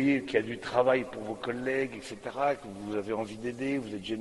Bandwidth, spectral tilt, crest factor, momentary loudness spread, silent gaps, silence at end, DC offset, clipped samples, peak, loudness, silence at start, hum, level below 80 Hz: 11.5 kHz; -6 dB/octave; 20 dB; 10 LU; none; 0 s; under 0.1%; under 0.1%; -12 dBFS; -31 LUFS; 0 s; none; -62 dBFS